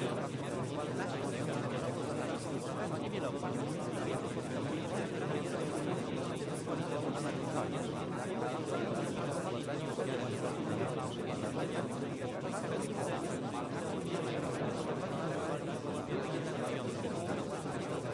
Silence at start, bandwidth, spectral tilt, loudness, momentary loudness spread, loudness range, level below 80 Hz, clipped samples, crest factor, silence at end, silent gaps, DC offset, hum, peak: 0 s; 11.5 kHz; -6 dB/octave; -38 LUFS; 2 LU; 1 LU; -68 dBFS; under 0.1%; 14 dB; 0 s; none; under 0.1%; none; -22 dBFS